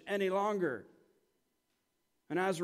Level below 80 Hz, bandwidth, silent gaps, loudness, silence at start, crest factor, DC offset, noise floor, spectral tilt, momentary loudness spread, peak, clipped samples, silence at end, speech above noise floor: -86 dBFS; 15.5 kHz; none; -35 LUFS; 0.05 s; 16 dB; under 0.1%; -81 dBFS; -5.5 dB/octave; 7 LU; -22 dBFS; under 0.1%; 0 s; 47 dB